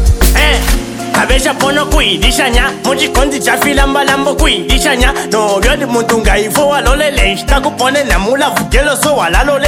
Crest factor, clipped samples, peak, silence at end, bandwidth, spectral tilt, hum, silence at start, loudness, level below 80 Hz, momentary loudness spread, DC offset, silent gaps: 10 dB; 0.4%; 0 dBFS; 0 s; over 20 kHz; -3.5 dB/octave; none; 0 s; -11 LUFS; -16 dBFS; 3 LU; under 0.1%; none